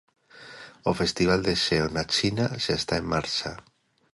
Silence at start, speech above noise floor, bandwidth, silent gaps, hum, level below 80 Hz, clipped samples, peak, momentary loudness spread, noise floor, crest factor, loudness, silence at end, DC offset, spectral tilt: 0.35 s; 21 dB; 11.5 kHz; none; none; -48 dBFS; under 0.1%; -10 dBFS; 18 LU; -46 dBFS; 18 dB; -25 LUFS; 0.5 s; under 0.1%; -4.5 dB/octave